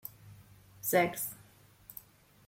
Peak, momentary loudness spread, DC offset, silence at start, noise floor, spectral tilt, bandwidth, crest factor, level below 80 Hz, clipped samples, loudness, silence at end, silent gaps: -14 dBFS; 23 LU; under 0.1%; 0.05 s; -60 dBFS; -4 dB/octave; 17 kHz; 24 dB; -70 dBFS; under 0.1%; -32 LUFS; 0.55 s; none